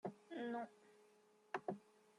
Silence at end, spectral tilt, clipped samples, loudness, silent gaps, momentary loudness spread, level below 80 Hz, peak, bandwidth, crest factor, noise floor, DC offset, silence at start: 0.35 s; -6.5 dB/octave; under 0.1%; -50 LUFS; none; 17 LU; under -90 dBFS; -28 dBFS; 11.5 kHz; 22 dB; -72 dBFS; under 0.1%; 0.05 s